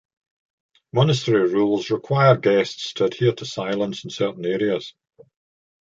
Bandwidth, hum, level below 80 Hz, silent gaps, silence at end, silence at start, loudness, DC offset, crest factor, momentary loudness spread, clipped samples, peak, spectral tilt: 7.8 kHz; none; -62 dBFS; none; 0.9 s; 0.95 s; -21 LUFS; under 0.1%; 18 dB; 10 LU; under 0.1%; -4 dBFS; -6.5 dB/octave